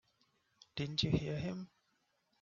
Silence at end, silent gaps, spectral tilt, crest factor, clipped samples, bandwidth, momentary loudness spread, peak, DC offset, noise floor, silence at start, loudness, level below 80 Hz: 0.75 s; none; -5.5 dB/octave; 22 dB; under 0.1%; 7.4 kHz; 14 LU; -18 dBFS; under 0.1%; -79 dBFS; 0.75 s; -38 LUFS; -60 dBFS